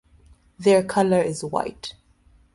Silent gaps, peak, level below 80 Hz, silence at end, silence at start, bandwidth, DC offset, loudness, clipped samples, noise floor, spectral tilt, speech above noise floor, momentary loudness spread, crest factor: none; -6 dBFS; -56 dBFS; 0.65 s; 0.6 s; 11.5 kHz; under 0.1%; -22 LUFS; under 0.1%; -57 dBFS; -5.5 dB/octave; 36 dB; 16 LU; 18 dB